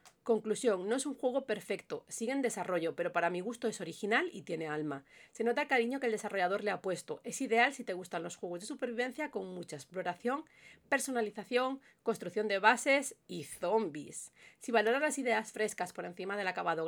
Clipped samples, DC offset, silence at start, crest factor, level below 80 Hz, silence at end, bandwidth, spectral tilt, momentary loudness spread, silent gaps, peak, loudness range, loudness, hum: under 0.1%; under 0.1%; 0.05 s; 24 dB; -82 dBFS; 0 s; over 20 kHz; -3.5 dB/octave; 12 LU; none; -10 dBFS; 4 LU; -35 LUFS; none